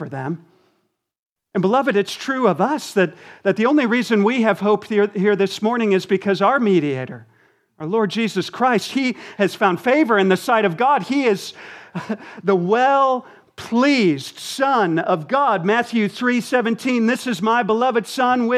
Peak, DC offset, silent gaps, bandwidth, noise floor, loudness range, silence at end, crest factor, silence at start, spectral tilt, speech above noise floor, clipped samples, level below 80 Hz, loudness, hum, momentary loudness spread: -2 dBFS; under 0.1%; 1.19-1.36 s; 14.5 kHz; -69 dBFS; 2 LU; 0 s; 18 dB; 0 s; -5.5 dB/octave; 50 dB; under 0.1%; -72 dBFS; -19 LUFS; none; 10 LU